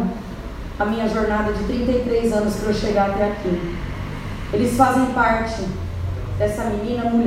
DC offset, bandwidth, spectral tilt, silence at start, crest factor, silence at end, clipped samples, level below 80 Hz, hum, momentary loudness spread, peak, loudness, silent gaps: under 0.1%; 16 kHz; -6.5 dB/octave; 0 s; 20 dB; 0 s; under 0.1%; -32 dBFS; none; 12 LU; 0 dBFS; -21 LUFS; none